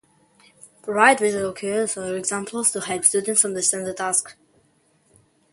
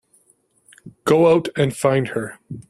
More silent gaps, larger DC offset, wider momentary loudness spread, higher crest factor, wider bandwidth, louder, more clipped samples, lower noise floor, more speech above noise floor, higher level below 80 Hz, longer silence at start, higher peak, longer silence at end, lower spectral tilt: neither; neither; second, 10 LU vs 13 LU; first, 24 dB vs 18 dB; second, 12 kHz vs 13.5 kHz; about the same, -20 LUFS vs -18 LUFS; neither; about the same, -62 dBFS vs -61 dBFS; about the same, 41 dB vs 43 dB; second, -66 dBFS vs -56 dBFS; about the same, 0.85 s vs 0.85 s; about the same, 0 dBFS vs -2 dBFS; first, 1.2 s vs 0.1 s; second, -2 dB/octave vs -6 dB/octave